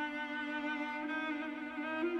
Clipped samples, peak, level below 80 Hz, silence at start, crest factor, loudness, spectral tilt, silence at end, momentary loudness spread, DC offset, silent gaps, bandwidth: under 0.1%; -26 dBFS; -76 dBFS; 0 s; 12 dB; -38 LUFS; -4 dB/octave; 0 s; 3 LU; under 0.1%; none; 9.4 kHz